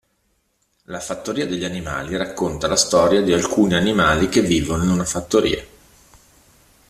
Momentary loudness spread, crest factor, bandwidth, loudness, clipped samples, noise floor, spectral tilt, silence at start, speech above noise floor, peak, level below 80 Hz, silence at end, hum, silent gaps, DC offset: 11 LU; 18 dB; 14.5 kHz; -19 LUFS; under 0.1%; -67 dBFS; -4.5 dB/octave; 0.9 s; 48 dB; -2 dBFS; -42 dBFS; 1.25 s; none; none; under 0.1%